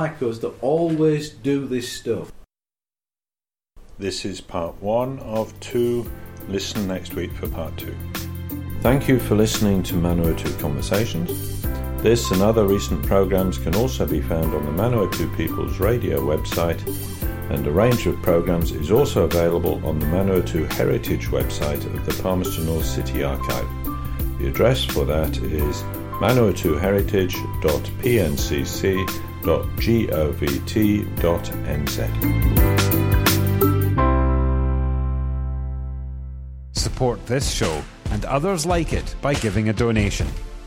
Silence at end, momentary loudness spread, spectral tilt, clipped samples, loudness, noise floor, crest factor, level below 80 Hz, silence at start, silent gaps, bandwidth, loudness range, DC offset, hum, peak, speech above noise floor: 0 s; 10 LU; -6 dB/octave; under 0.1%; -22 LUFS; under -90 dBFS; 16 dB; -30 dBFS; 0 s; none; 17 kHz; 6 LU; under 0.1%; none; -4 dBFS; over 69 dB